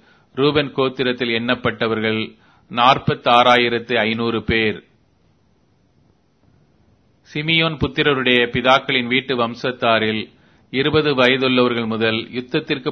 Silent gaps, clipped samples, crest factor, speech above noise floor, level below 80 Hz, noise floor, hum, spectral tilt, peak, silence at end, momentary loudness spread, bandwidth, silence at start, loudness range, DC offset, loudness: none; under 0.1%; 20 dB; 41 dB; -48 dBFS; -59 dBFS; none; -6 dB/octave; 0 dBFS; 0 s; 9 LU; 6.6 kHz; 0.35 s; 7 LU; under 0.1%; -17 LUFS